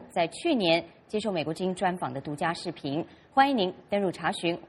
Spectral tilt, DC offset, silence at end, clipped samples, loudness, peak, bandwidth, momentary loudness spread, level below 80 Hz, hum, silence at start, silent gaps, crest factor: -5 dB/octave; under 0.1%; 0 s; under 0.1%; -28 LUFS; -8 dBFS; 12 kHz; 10 LU; -66 dBFS; none; 0 s; none; 20 dB